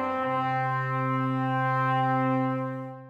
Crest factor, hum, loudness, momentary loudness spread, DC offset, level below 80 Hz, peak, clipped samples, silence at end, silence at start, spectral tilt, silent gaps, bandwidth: 12 dB; none; -27 LUFS; 3 LU; under 0.1%; -74 dBFS; -14 dBFS; under 0.1%; 0 s; 0 s; -8.5 dB/octave; none; 5.2 kHz